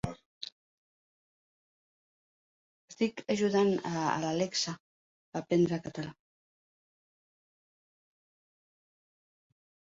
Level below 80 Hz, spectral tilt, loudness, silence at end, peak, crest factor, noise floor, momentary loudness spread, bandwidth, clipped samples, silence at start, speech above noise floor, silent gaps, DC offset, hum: -66 dBFS; -5 dB/octave; -31 LUFS; 3.8 s; -14 dBFS; 22 dB; under -90 dBFS; 16 LU; 8.2 kHz; under 0.1%; 0.05 s; over 60 dB; 0.26-0.41 s, 0.52-2.88 s, 4.80-5.32 s; under 0.1%; none